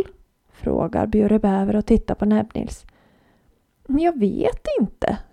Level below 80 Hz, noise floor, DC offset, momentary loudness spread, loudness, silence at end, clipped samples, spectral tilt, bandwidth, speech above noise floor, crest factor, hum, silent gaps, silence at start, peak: -36 dBFS; -61 dBFS; under 0.1%; 12 LU; -21 LUFS; 0.1 s; under 0.1%; -8 dB/octave; 10 kHz; 41 dB; 18 dB; none; none; 0 s; -2 dBFS